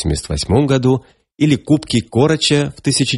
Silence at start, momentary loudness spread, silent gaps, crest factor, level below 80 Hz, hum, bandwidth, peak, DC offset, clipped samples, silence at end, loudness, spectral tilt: 0 s; 6 LU; none; 14 dB; -34 dBFS; none; 11.5 kHz; 0 dBFS; under 0.1%; under 0.1%; 0 s; -16 LUFS; -5 dB/octave